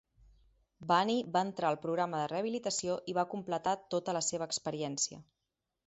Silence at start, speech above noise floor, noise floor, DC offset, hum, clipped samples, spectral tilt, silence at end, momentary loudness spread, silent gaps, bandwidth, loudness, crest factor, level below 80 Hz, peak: 0.8 s; 53 dB; -87 dBFS; under 0.1%; none; under 0.1%; -3.5 dB/octave; 0.65 s; 5 LU; none; 8 kHz; -34 LUFS; 20 dB; -72 dBFS; -14 dBFS